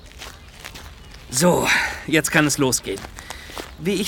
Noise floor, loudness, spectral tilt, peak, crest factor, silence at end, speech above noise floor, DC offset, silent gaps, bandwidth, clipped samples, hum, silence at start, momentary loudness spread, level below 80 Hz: -40 dBFS; -19 LUFS; -3.5 dB/octave; -2 dBFS; 20 dB; 0 s; 21 dB; under 0.1%; none; 19.5 kHz; under 0.1%; none; 0.05 s; 21 LU; -44 dBFS